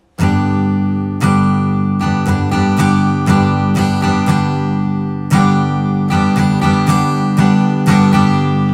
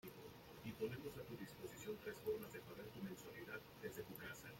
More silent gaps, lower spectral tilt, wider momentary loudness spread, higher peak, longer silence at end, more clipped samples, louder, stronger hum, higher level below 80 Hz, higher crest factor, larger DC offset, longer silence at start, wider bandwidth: neither; first, -7 dB/octave vs -5 dB/octave; second, 4 LU vs 8 LU; first, 0 dBFS vs -34 dBFS; about the same, 0 s vs 0 s; neither; first, -14 LUFS vs -52 LUFS; neither; first, -44 dBFS vs -74 dBFS; second, 12 dB vs 18 dB; neither; first, 0.2 s vs 0.05 s; second, 14.5 kHz vs 16.5 kHz